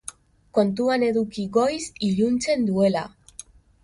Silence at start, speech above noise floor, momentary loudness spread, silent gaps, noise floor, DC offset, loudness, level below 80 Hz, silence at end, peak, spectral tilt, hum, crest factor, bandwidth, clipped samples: 0.55 s; 24 dB; 18 LU; none; -46 dBFS; under 0.1%; -23 LUFS; -56 dBFS; 0.75 s; -8 dBFS; -5.5 dB/octave; none; 16 dB; 11.5 kHz; under 0.1%